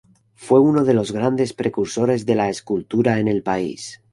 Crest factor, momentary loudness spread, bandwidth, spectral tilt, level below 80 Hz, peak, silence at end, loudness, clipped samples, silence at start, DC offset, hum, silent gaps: 16 dB; 8 LU; 11.5 kHz; -6.5 dB/octave; -54 dBFS; -2 dBFS; 0.2 s; -19 LUFS; under 0.1%; 0.4 s; under 0.1%; none; none